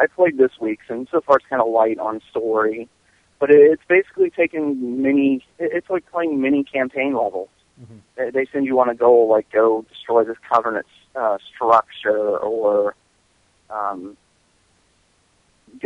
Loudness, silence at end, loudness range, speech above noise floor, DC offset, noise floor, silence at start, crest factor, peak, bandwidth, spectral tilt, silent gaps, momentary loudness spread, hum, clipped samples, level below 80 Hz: -19 LUFS; 0.05 s; 5 LU; 43 dB; under 0.1%; -61 dBFS; 0 s; 18 dB; -2 dBFS; 6.2 kHz; -7 dB/octave; none; 12 LU; none; under 0.1%; -66 dBFS